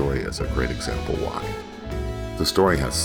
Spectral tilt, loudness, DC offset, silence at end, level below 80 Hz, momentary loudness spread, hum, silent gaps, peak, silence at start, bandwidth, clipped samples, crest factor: -4.5 dB/octave; -25 LUFS; under 0.1%; 0 s; -32 dBFS; 12 LU; none; none; -6 dBFS; 0 s; 19 kHz; under 0.1%; 18 dB